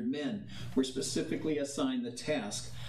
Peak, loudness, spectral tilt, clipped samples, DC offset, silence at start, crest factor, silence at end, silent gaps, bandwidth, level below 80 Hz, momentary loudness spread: -18 dBFS; -35 LUFS; -4.5 dB/octave; under 0.1%; under 0.1%; 0 s; 16 dB; 0 s; none; 13.5 kHz; -60 dBFS; 5 LU